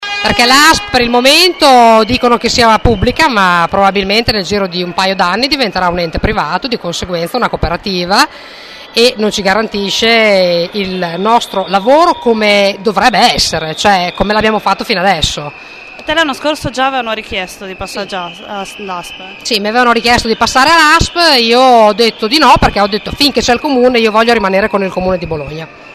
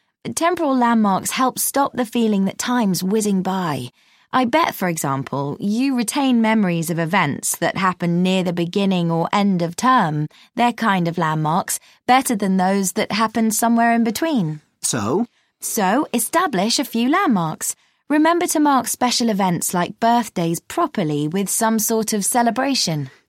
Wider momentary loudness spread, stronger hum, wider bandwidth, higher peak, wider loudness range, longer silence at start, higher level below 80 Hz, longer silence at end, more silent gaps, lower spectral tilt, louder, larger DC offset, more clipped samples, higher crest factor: first, 14 LU vs 6 LU; neither; second, 14 kHz vs 16.5 kHz; about the same, 0 dBFS vs -2 dBFS; first, 7 LU vs 2 LU; second, 0 s vs 0.25 s; first, -30 dBFS vs -64 dBFS; second, 0 s vs 0.2 s; neither; about the same, -3.5 dB/octave vs -4.5 dB/octave; first, -10 LUFS vs -19 LUFS; neither; first, 0.1% vs under 0.1%; second, 10 dB vs 18 dB